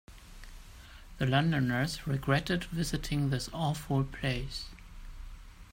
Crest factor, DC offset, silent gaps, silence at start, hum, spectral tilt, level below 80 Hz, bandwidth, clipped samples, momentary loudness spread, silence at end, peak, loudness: 20 dB; under 0.1%; none; 0.1 s; none; -5.5 dB/octave; -46 dBFS; 16 kHz; under 0.1%; 23 LU; 0 s; -14 dBFS; -32 LUFS